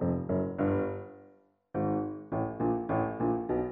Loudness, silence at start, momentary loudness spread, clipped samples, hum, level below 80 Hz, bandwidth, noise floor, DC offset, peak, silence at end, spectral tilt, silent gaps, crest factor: -32 LUFS; 0 s; 7 LU; under 0.1%; none; -56 dBFS; 3.6 kHz; -61 dBFS; under 0.1%; -16 dBFS; 0 s; -10 dB/octave; none; 16 dB